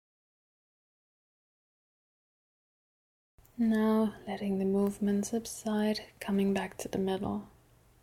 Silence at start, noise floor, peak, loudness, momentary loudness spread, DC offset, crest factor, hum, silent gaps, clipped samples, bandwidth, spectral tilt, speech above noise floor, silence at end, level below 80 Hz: 3.6 s; -62 dBFS; -20 dBFS; -32 LUFS; 8 LU; under 0.1%; 14 dB; none; none; under 0.1%; 16 kHz; -6 dB/octave; 31 dB; 0.55 s; -62 dBFS